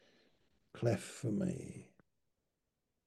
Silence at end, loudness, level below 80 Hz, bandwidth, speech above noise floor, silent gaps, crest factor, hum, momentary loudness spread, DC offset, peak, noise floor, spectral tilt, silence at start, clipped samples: 1.2 s; -39 LUFS; -76 dBFS; 12.5 kHz; 49 dB; none; 24 dB; none; 17 LU; under 0.1%; -20 dBFS; -87 dBFS; -6.5 dB/octave; 0.75 s; under 0.1%